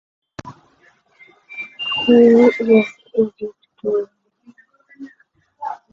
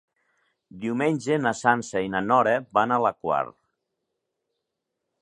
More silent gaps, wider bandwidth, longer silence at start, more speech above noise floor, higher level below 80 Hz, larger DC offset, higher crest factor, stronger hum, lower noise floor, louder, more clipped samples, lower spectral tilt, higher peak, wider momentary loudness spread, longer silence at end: neither; second, 7.2 kHz vs 11 kHz; second, 0.45 s vs 0.75 s; second, 44 dB vs 59 dB; first, -60 dBFS vs -66 dBFS; neither; about the same, 18 dB vs 22 dB; neither; second, -58 dBFS vs -82 dBFS; first, -15 LUFS vs -24 LUFS; neither; about the same, -6.5 dB/octave vs -5.5 dB/octave; about the same, -2 dBFS vs -4 dBFS; first, 24 LU vs 7 LU; second, 0.2 s vs 1.7 s